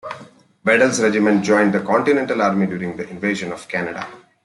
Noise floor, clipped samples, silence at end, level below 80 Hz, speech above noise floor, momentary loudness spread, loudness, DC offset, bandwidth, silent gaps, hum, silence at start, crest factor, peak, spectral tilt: -44 dBFS; under 0.1%; 0.25 s; -62 dBFS; 26 dB; 13 LU; -18 LUFS; under 0.1%; 11.5 kHz; none; none; 0.05 s; 16 dB; -2 dBFS; -5 dB/octave